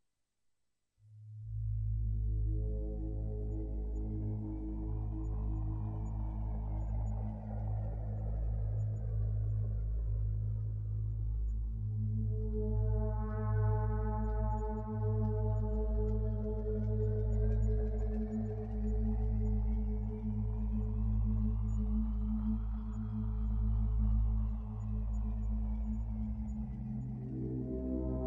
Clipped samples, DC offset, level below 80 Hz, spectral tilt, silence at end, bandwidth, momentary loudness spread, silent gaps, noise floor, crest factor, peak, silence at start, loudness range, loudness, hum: under 0.1%; under 0.1%; -36 dBFS; -11.5 dB/octave; 0 s; 2.1 kHz; 6 LU; none; -83 dBFS; 12 dB; -22 dBFS; 1.1 s; 4 LU; -37 LUFS; none